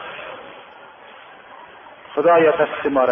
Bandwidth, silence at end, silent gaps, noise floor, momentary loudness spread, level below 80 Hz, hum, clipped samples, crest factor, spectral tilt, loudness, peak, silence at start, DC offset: 3.7 kHz; 0 s; none; -42 dBFS; 27 LU; -60 dBFS; none; under 0.1%; 16 dB; -8.5 dB/octave; -17 LUFS; -4 dBFS; 0 s; under 0.1%